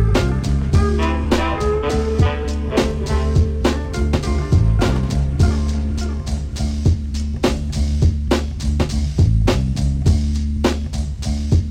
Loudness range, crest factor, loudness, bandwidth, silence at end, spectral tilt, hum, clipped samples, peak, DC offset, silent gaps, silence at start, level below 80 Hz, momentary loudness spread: 2 LU; 16 dB; -19 LUFS; 11 kHz; 0 s; -6.5 dB/octave; none; under 0.1%; -2 dBFS; under 0.1%; none; 0 s; -20 dBFS; 6 LU